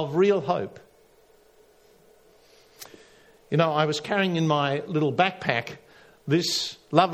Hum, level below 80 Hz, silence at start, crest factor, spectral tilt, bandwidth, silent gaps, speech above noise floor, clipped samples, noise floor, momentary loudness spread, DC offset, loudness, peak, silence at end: none; -68 dBFS; 0 s; 24 dB; -5 dB/octave; 15.5 kHz; none; 34 dB; under 0.1%; -58 dBFS; 21 LU; under 0.1%; -24 LUFS; -2 dBFS; 0 s